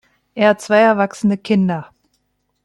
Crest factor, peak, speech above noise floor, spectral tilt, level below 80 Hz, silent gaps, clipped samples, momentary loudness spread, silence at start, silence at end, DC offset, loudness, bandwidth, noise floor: 16 dB; -2 dBFS; 52 dB; -6.5 dB/octave; -60 dBFS; none; under 0.1%; 10 LU; 0.35 s; 0.8 s; under 0.1%; -16 LUFS; 12 kHz; -67 dBFS